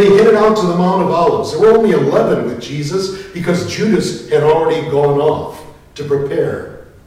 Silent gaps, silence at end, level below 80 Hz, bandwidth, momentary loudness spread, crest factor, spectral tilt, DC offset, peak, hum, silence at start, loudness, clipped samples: none; 0.2 s; -44 dBFS; 13.5 kHz; 12 LU; 10 dB; -6.5 dB/octave; under 0.1%; -2 dBFS; none; 0 s; -14 LUFS; under 0.1%